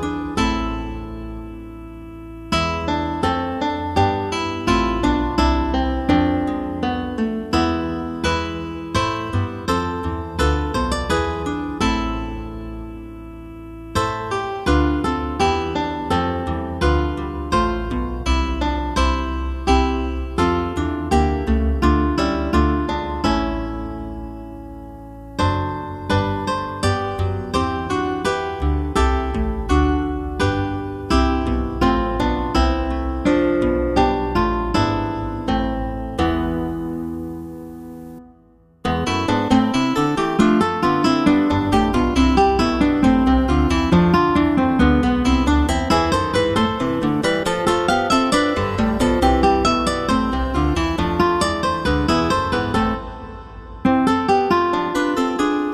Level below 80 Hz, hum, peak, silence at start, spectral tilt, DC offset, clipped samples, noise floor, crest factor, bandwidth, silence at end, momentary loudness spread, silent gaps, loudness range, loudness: -28 dBFS; none; -2 dBFS; 0 s; -6 dB/octave; under 0.1%; under 0.1%; -52 dBFS; 16 dB; 13 kHz; 0 s; 13 LU; none; 7 LU; -20 LUFS